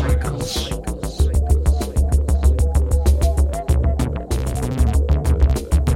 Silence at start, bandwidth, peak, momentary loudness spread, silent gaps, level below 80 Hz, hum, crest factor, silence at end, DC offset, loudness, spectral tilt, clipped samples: 0 s; 14.5 kHz; -2 dBFS; 6 LU; none; -18 dBFS; none; 14 dB; 0 s; under 0.1%; -20 LUFS; -6.5 dB/octave; under 0.1%